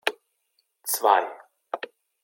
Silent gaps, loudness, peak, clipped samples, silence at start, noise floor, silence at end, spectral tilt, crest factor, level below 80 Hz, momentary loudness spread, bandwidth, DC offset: none; -25 LUFS; -4 dBFS; under 0.1%; 0.05 s; -73 dBFS; 0.45 s; 1 dB/octave; 24 dB; -88 dBFS; 16 LU; 17 kHz; under 0.1%